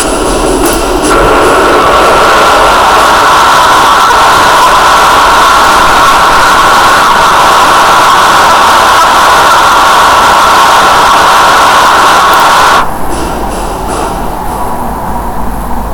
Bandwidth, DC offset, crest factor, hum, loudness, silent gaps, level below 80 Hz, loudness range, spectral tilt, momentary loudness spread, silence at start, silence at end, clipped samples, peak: over 20 kHz; under 0.1%; 4 dB; none; -4 LUFS; none; -22 dBFS; 4 LU; -2.5 dB/octave; 11 LU; 0 s; 0 s; 10%; 0 dBFS